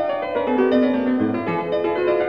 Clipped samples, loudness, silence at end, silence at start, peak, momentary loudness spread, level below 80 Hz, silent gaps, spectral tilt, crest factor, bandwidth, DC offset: under 0.1%; -20 LUFS; 0 s; 0 s; -6 dBFS; 5 LU; -58 dBFS; none; -8.5 dB/octave; 14 dB; 5.2 kHz; 0.2%